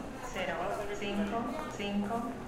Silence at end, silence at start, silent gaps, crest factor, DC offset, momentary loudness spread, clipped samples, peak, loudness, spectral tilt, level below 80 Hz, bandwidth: 0 s; 0 s; none; 14 dB; under 0.1%; 3 LU; under 0.1%; -22 dBFS; -36 LUFS; -5.5 dB/octave; -52 dBFS; 16 kHz